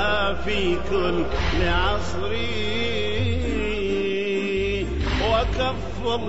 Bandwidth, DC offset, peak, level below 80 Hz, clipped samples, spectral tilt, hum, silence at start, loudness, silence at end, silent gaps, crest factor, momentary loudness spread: 8 kHz; 4%; -8 dBFS; -32 dBFS; under 0.1%; -5.5 dB/octave; none; 0 s; -24 LUFS; 0 s; none; 14 dB; 4 LU